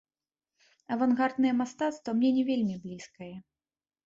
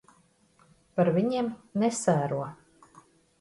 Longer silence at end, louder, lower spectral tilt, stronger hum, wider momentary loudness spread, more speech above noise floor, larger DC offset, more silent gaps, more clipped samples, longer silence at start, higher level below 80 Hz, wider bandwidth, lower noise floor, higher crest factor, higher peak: second, 0.65 s vs 0.85 s; about the same, -28 LUFS vs -28 LUFS; about the same, -6 dB/octave vs -6 dB/octave; neither; first, 18 LU vs 10 LU; first, over 61 dB vs 37 dB; neither; neither; neither; about the same, 0.9 s vs 0.95 s; about the same, -72 dBFS vs -68 dBFS; second, 7.6 kHz vs 11.5 kHz; first, under -90 dBFS vs -64 dBFS; about the same, 16 dB vs 20 dB; second, -14 dBFS vs -10 dBFS